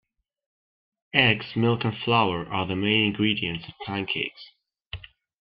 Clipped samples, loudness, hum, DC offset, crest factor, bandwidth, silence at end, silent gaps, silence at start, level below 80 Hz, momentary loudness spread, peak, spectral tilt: under 0.1%; -24 LUFS; none; under 0.1%; 24 dB; 5.6 kHz; 0.4 s; 4.87-4.91 s; 1.15 s; -56 dBFS; 15 LU; -2 dBFS; -9 dB/octave